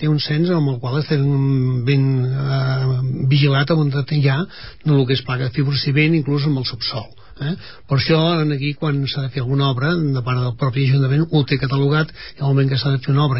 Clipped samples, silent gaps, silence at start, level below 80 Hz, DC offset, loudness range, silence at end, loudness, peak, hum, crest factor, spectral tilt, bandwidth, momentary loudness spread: under 0.1%; none; 0 s; -48 dBFS; 0.8%; 2 LU; 0 s; -18 LUFS; -4 dBFS; none; 14 dB; -11 dB/octave; 5.8 kHz; 7 LU